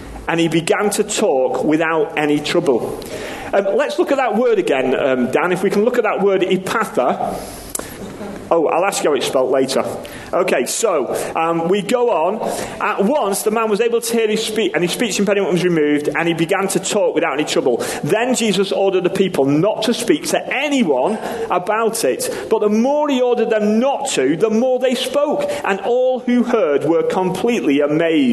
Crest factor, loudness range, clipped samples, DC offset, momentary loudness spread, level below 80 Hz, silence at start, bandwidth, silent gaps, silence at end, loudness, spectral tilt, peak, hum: 16 dB; 2 LU; under 0.1%; under 0.1%; 5 LU; -50 dBFS; 0 s; 13 kHz; none; 0 s; -17 LUFS; -4.5 dB/octave; 0 dBFS; none